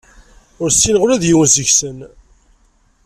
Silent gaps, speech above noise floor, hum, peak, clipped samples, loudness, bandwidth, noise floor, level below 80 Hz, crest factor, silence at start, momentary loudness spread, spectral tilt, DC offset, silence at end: none; 41 dB; none; 0 dBFS; under 0.1%; -12 LUFS; 14.5 kHz; -55 dBFS; -40 dBFS; 16 dB; 0.6 s; 9 LU; -3 dB/octave; under 0.1%; 1 s